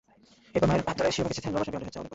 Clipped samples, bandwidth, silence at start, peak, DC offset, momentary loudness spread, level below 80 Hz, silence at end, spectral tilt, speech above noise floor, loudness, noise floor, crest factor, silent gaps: under 0.1%; 8 kHz; 0.55 s; -12 dBFS; under 0.1%; 8 LU; -50 dBFS; 0 s; -5.5 dB/octave; 31 dB; -29 LUFS; -59 dBFS; 18 dB; none